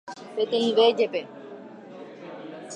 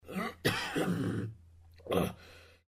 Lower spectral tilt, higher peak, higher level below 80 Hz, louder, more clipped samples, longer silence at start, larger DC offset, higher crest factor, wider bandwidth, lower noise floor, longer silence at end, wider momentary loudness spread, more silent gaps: second, -4 dB/octave vs -5.5 dB/octave; first, -8 dBFS vs -16 dBFS; second, -84 dBFS vs -60 dBFS; first, -23 LUFS vs -34 LUFS; neither; about the same, 0.05 s vs 0.05 s; neither; about the same, 18 dB vs 20 dB; second, 9.8 kHz vs 15.5 kHz; second, -43 dBFS vs -57 dBFS; second, 0 s vs 0.2 s; first, 23 LU vs 19 LU; neither